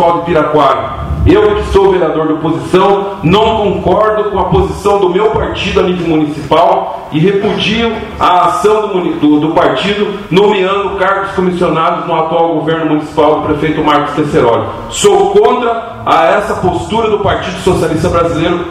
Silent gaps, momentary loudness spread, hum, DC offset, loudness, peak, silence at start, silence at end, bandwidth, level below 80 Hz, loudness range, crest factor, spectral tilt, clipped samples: none; 5 LU; none; under 0.1%; -11 LUFS; 0 dBFS; 0 s; 0 s; 13.5 kHz; -28 dBFS; 1 LU; 10 dB; -6 dB/octave; 0.4%